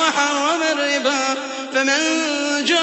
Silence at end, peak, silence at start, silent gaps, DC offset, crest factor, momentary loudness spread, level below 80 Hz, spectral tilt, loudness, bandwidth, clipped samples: 0 s; -4 dBFS; 0 s; none; under 0.1%; 16 dB; 5 LU; -72 dBFS; 0 dB/octave; -18 LUFS; 8.4 kHz; under 0.1%